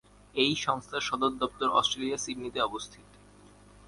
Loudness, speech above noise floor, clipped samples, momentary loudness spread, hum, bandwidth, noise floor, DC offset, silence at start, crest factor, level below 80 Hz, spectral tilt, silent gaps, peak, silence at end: -29 LUFS; 25 dB; under 0.1%; 9 LU; 50 Hz at -60 dBFS; 11.5 kHz; -55 dBFS; under 0.1%; 0.35 s; 22 dB; -60 dBFS; -3 dB/octave; none; -10 dBFS; 0.4 s